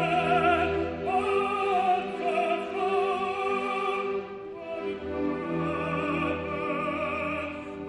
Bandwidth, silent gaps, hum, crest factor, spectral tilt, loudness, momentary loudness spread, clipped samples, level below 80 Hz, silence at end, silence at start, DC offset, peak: 11 kHz; none; none; 16 dB; -6.5 dB/octave; -28 LUFS; 9 LU; under 0.1%; -54 dBFS; 0 s; 0 s; under 0.1%; -12 dBFS